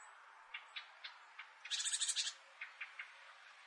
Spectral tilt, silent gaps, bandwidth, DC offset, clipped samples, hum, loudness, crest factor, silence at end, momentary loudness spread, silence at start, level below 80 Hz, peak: 8 dB/octave; none; 11.5 kHz; under 0.1%; under 0.1%; none; -42 LUFS; 22 dB; 0 s; 21 LU; 0 s; under -90 dBFS; -24 dBFS